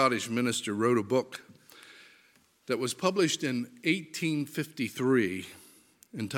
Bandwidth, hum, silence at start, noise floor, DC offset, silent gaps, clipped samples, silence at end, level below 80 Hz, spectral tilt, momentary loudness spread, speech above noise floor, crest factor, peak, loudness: 17 kHz; none; 0 s; -64 dBFS; under 0.1%; none; under 0.1%; 0 s; -76 dBFS; -4.5 dB/octave; 19 LU; 35 dB; 20 dB; -10 dBFS; -30 LUFS